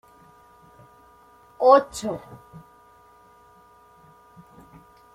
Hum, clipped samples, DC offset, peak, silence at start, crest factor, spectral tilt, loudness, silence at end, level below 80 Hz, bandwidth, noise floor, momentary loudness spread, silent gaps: none; under 0.1%; under 0.1%; -4 dBFS; 1.6 s; 24 dB; -4.5 dB/octave; -20 LUFS; 2.8 s; -62 dBFS; 14 kHz; -54 dBFS; 28 LU; none